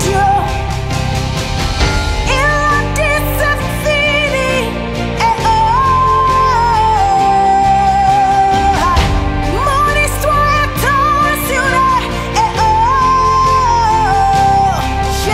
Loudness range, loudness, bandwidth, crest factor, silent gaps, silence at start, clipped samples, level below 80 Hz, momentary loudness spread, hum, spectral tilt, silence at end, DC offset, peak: 3 LU; -12 LUFS; 16 kHz; 12 dB; none; 0 s; under 0.1%; -22 dBFS; 6 LU; none; -4.5 dB/octave; 0 s; under 0.1%; 0 dBFS